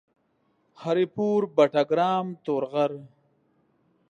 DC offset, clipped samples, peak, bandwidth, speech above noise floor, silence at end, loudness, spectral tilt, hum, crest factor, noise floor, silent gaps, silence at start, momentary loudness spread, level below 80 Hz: under 0.1%; under 0.1%; -8 dBFS; 9.4 kHz; 45 dB; 1.05 s; -25 LUFS; -7 dB/octave; none; 20 dB; -70 dBFS; none; 0.8 s; 8 LU; -76 dBFS